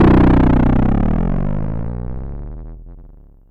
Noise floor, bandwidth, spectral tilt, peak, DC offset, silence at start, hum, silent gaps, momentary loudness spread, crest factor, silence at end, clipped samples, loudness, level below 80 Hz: -41 dBFS; 5.2 kHz; -10.5 dB/octave; -6 dBFS; under 0.1%; 0 s; none; none; 21 LU; 10 dB; 0.4 s; under 0.1%; -16 LUFS; -20 dBFS